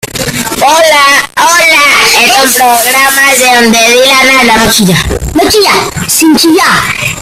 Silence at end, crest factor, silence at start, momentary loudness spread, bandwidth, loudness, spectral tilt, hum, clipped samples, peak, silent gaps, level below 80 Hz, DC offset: 0 s; 6 dB; 0.05 s; 6 LU; over 20 kHz; -4 LUFS; -2 dB/octave; none; 2%; 0 dBFS; none; -28 dBFS; under 0.1%